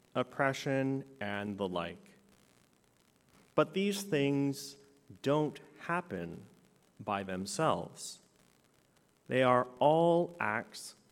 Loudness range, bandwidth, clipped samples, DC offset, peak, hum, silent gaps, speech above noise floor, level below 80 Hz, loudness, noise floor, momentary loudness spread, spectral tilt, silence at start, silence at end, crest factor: 6 LU; 16.5 kHz; under 0.1%; under 0.1%; -12 dBFS; none; none; 36 dB; -76 dBFS; -33 LUFS; -69 dBFS; 17 LU; -5.5 dB/octave; 0.15 s; 0.2 s; 22 dB